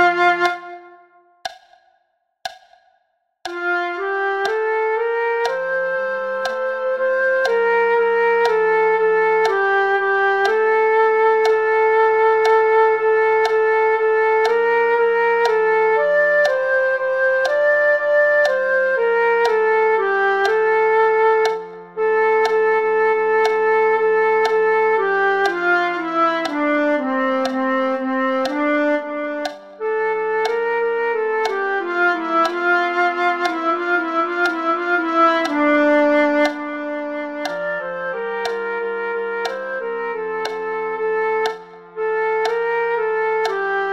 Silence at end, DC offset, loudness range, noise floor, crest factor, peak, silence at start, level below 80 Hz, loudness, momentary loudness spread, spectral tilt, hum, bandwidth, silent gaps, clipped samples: 0 s; 0.2%; 8 LU; -67 dBFS; 14 dB; -4 dBFS; 0 s; -68 dBFS; -18 LUFS; 9 LU; -4 dB/octave; none; 10.5 kHz; none; under 0.1%